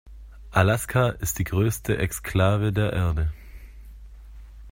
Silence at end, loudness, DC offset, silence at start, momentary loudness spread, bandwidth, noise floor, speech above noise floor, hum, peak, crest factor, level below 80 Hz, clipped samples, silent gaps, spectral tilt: 0 s; -24 LUFS; under 0.1%; 0.05 s; 6 LU; 16.5 kHz; -43 dBFS; 20 dB; none; -4 dBFS; 20 dB; -38 dBFS; under 0.1%; none; -5.5 dB/octave